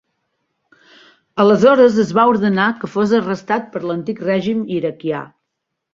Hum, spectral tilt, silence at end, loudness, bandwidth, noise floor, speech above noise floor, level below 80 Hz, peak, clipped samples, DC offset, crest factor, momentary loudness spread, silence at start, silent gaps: none; -7 dB/octave; 0.7 s; -16 LUFS; 7.6 kHz; -77 dBFS; 61 dB; -58 dBFS; -2 dBFS; under 0.1%; under 0.1%; 16 dB; 13 LU; 1.35 s; none